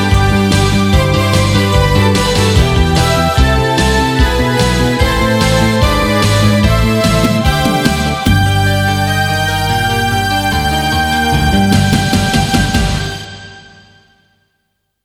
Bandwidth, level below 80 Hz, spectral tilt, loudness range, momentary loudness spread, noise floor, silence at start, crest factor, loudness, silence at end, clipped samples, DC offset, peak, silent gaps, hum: over 20 kHz; -20 dBFS; -5 dB/octave; 2 LU; 3 LU; -66 dBFS; 0 s; 12 dB; -12 LUFS; 1.45 s; under 0.1%; under 0.1%; 0 dBFS; none; none